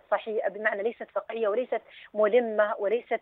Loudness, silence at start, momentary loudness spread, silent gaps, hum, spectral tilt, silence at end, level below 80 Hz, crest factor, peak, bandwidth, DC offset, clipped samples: -28 LUFS; 0.1 s; 10 LU; none; none; -8 dB/octave; 0.05 s; -80 dBFS; 18 dB; -10 dBFS; 4.1 kHz; under 0.1%; under 0.1%